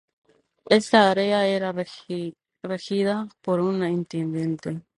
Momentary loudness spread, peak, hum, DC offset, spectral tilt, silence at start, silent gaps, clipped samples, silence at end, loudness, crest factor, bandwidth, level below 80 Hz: 14 LU; -2 dBFS; none; under 0.1%; -5.5 dB/octave; 0.65 s; none; under 0.1%; 0.2 s; -24 LUFS; 22 dB; 11.5 kHz; -66 dBFS